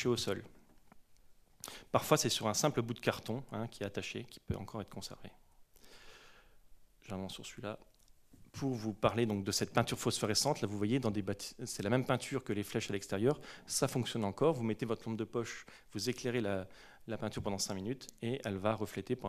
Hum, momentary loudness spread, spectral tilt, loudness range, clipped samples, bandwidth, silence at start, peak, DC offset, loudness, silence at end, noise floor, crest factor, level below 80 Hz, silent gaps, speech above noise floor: none; 14 LU; -4.5 dB/octave; 13 LU; under 0.1%; 14.5 kHz; 0 s; -12 dBFS; under 0.1%; -36 LUFS; 0 s; -62 dBFS; 26 dB; -64 dBFS; none; 26 dB